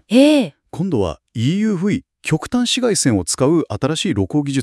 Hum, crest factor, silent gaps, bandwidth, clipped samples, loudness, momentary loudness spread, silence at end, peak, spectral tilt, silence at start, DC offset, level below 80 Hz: none; 16 dB; none; 12 kHz; under 0.1%; -18 LUFS; 8 LU; 0 s; 0 dBFS; -5 dB/octave; 0.1 s; under 0.1%; -48 dBFS